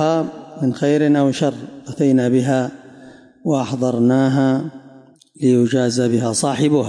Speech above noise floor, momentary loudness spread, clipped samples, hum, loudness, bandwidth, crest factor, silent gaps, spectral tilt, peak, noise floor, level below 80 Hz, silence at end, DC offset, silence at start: 29 dB; 10 LU; under 0.1%; none; -18 LUFS; 11.5 kHz; 12 dB; none; -6 dB/octave; -6 dBFS; -46 dBFS; -64 dBFS; 0 s; under 0.1%; 0 s